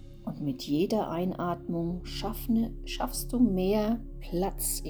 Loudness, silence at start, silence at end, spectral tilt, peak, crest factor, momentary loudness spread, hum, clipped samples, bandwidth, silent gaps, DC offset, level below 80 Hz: -30 LUFS; 0 s; 0 s; -5.5 dB/octave; -14 dBFS; 16 dB; 8 LU; none; under 0.1%; over 20 kHz; none; under 0.1%; -42 dBFS